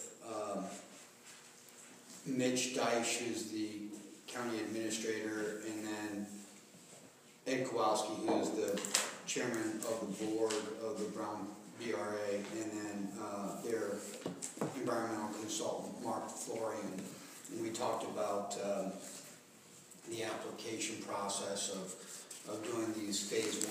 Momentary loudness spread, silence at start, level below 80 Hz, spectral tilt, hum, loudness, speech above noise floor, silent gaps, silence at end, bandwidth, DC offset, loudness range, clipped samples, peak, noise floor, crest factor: 18 LU; 0 s; -88 dBFS; -3 dB/octave; none; -39 LUFS; 21 dB; none; 0 s; 15.5 kHz; under 0.1%; 5 LU; under 0.1%; -10 dBFS; -60 dBFS; 30 dB